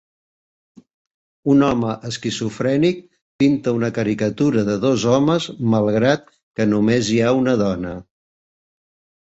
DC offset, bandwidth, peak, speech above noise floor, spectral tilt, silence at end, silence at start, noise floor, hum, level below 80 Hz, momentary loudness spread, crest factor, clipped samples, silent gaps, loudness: under 0.1%; 8.2 kHz; -2 dBFS; over 72 dB; -6 dB/octave; 1.2 s; 1.45 s; under -90 dBFS; none; -52 dBFS; 9 LU; 16 dB; under 0.1%; 3.22-3.39 s, 6.43-6.51 s; -19 LUFS